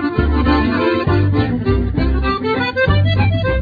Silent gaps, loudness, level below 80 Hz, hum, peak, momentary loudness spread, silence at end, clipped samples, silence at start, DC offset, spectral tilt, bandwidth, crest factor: none; -16 LUFS; -22 dBFS; none; -2 dBFS; 3 LU; 0 s; under 0.1%; 0 s; under 0.1%; -9 dB/octave; 5 kHz; 14 dB